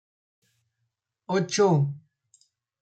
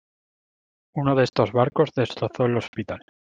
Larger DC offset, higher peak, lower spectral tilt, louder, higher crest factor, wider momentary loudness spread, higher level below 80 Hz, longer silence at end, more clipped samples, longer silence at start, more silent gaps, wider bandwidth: neither; second, -12 dBFS vs -4 dBFS; second, -5.5 dB/octave vs -7.5 dB/octave; about the same, -24 LUFS vs -23 LUFS; about the same, 18 dB vs 20 dB; second, 10 LU vs 13 LU; second, -74 dBFS vs -58 dBFS; first, 0.8 s vs 0.35 s; neither; first, 1.3 s vs 0.95 s; second, none vs 2.68-2.73 s; first, 9.2 kHz vs 7.6 kHz